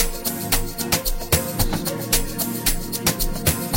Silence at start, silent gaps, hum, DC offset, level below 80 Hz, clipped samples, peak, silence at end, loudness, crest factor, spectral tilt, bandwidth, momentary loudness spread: 0 s; none; none; under 0.1%; -28 dBFS; under 0.1%; -2 dBFS; 0 s; -22 LUFS; 20 dB; -3 dB/octave; 17 kHz; 2 LU